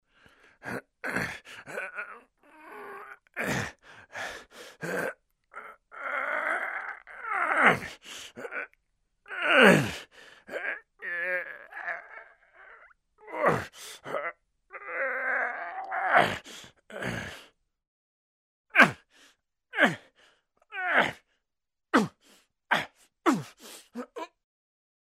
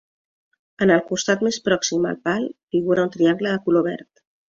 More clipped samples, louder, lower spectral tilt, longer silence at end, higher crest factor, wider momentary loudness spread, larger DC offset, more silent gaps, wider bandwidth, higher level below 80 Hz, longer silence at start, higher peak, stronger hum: neither; second, -28 LUFS vs -21 LUFS; about the same, -4.5 dB/octave vs -4.5 dB/octave; first, 0.85 s vs 0.5 s; first, 30 dB vs 18 dB; first, 22 LU vs 6 LU; neither; first, 17.87-18.64 s vs 2.63-2.67 s; first, 16 kHz vs 7.6 kHz; about the same, -66 dBFS vs -62 dBFS; second, 0.65 s vs 0.8 s; about the same, -2 dBFS vs -4 dBFS; neither